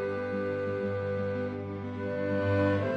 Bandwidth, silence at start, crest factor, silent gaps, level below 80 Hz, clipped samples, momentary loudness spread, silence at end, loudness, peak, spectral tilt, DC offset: 6.4 kHz; 0 s; 16 dB; none; -64 dBFS; under 0.1%; 8 LU; 0 s; -31 LUFS; -14 dBFS; -9 dB/octave; under 0.1%